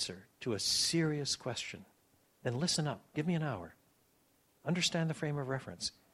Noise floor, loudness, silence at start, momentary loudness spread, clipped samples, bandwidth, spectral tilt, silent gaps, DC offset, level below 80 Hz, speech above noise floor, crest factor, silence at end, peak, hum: -72 dBFS; -35 LUFS; 0 s; 13 LU; under 0.1%; 14 kHz; -4 dB/octave; none; under 0.1%; -70 dBFS; 36 dB; 18 dB; 0.25 s; -20 dBFS; none